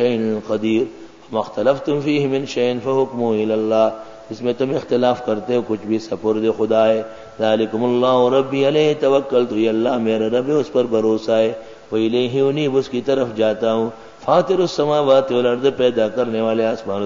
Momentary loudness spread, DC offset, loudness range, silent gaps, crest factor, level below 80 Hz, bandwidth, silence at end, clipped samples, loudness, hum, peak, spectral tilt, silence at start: 7 LU; 0.4%; 3 LU; none; 16 dB; -58 dBFS; 7.6 kHz; 0 s; under 0.1%; -18 LUFS; none; 0 dBFS; -6.5 dB/octave; 0 s